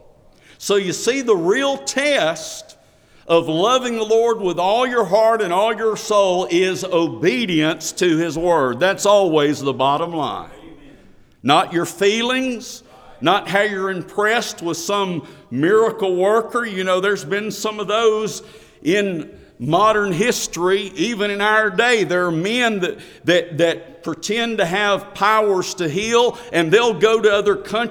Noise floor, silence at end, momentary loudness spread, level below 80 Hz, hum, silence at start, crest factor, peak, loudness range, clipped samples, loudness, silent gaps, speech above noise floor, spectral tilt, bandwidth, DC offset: -51 dBFS; 0 s; 9 LU; -54 dBFS; none; 0.6 s; 18 dB; 0 dBFS; 3 LU; under 0.1%; -18 LUFS; none; 33 dB; -4 dB/octave; 19 kHz; under 0.1%